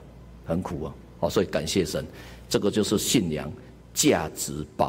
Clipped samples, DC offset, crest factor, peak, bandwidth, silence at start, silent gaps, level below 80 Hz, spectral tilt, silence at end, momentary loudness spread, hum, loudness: under 0.1%; under 0.1%; 18 dB; -8 dBFS; 16 kHz; 0 s; none; -48 dBFS; -4 dB/octave; 0 s; 16 LU; none; -26 LUFS